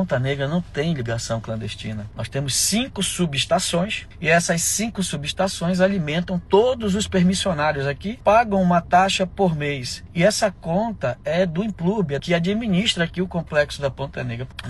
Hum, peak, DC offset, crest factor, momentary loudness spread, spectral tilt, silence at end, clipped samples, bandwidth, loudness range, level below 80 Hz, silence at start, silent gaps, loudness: none; -4 dBFS; under 0.1%; 16 dB; 9 LU; -4.5 dB/octave; 0 s; under 0.1%; 12.5 kHz; 3 LU; -42 dBFS; 0 s; none; -21 LUFS